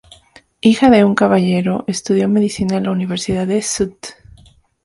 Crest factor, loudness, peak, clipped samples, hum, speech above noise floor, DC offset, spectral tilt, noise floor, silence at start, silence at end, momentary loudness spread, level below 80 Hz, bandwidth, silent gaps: 16 dB; -15 LUFS; 0 dBFS; under 0.1%; none; 33 dB; under 0.1%; -5.5 dB/octave; -48 dBFS; 0.65 s; 0.7 s; 10 LU; -46 dBFS; 11.5 kHz; none